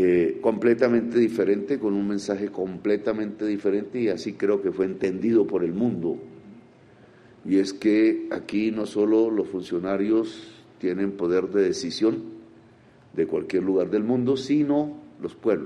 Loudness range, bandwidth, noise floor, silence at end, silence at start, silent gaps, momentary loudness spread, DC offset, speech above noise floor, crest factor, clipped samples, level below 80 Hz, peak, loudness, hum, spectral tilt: 3 LU; 10.5 kHz; -53 dBFS; 0 s; 0 s; none; 8 LU; under 0.1%; 30 dB; 18 dB; under 0.1%; -64 dBFS; -6 dBFS; -24 LUFS; none; -6.5 dB/octave